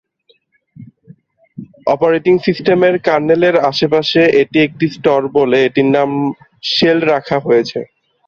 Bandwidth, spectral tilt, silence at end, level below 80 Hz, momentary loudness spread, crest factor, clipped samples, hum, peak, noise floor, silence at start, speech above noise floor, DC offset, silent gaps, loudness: 7.2 kHz; -6.5 dB/octave; 0.45 s; -54 dBFS; 8 LU; 12 dB; under 0.1%; none; -2 dBFS; -57 dBFS; 0.8 s; 44 dB; under 0.1%; none; -13 LUFS